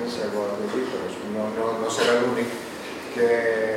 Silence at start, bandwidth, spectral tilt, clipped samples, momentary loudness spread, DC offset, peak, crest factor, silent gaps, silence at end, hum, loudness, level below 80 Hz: 0 s; 16.5 kHz; -4 dB/octave; under 0.1%; 11 LU; under 0.1%; -8 dBFS; 16 dB; none; 0 s; none; -25 LUFS; -66 dBFS